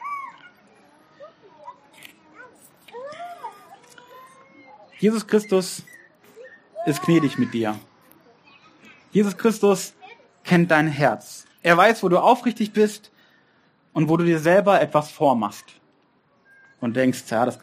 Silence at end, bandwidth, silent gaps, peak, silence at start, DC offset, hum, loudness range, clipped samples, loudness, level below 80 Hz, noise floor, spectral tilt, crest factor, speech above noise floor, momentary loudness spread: 0.05 s; 15.5 kHz; none; 0 dBFS; 0 s; under 0.1%; none; 22 LU; under 0.1%; -20 LUFS; -70 dBFS; -62 dBFS; -6 dB/octave; 22 dB; 42 dB; 21 LU